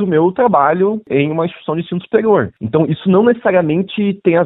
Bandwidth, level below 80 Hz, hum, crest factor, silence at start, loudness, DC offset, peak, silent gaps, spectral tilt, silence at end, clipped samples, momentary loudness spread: 4.1 kHz; -54 dBFS; none; 14 dB; 0 s; -14 LUFS; under 0.1%; 0 dBFS; none; -12 dB/octave; 0 s; under 0.1%; 7 LU